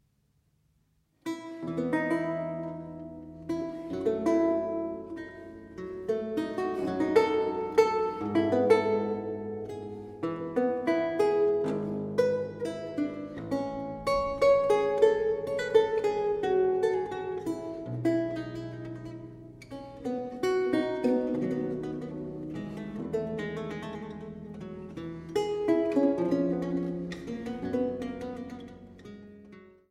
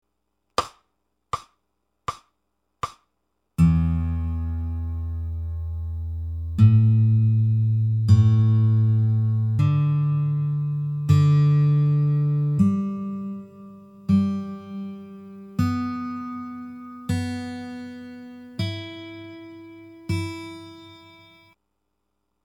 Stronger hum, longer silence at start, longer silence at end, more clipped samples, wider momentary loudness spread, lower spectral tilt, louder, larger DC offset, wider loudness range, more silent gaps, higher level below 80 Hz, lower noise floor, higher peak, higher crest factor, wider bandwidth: neither; first, 1.25 s vs 0.6 s; second, 0.2 s vs 1.5 s; neither; second, 17 LU vs 20 LU; second, -7 dB/octave vs -8.5 dB/octave; second, -30 LUFS vs -22 LUFS; neither; second, 8 LU vs 14 LU; neither; second, -60 dBFS vs -44 dBFS; second, -71 dBFS vs -77 dBFS; second, -10 dBFS vs -6 dBFS; about the same, 20 dB vs 18 dB; first, 13 kHz vs 10 kHz